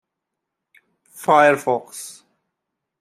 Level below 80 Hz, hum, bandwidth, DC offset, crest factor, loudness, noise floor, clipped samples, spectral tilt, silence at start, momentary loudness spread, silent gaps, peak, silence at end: -74 dBFS; none; 15 kHz; under 0.1%; 20 dB; -17 LUFS; -81 dBFS; under 0.1%; -4 dB/octave; 1.2 s; 20 LU; none; -2 dBFS; 0.9 s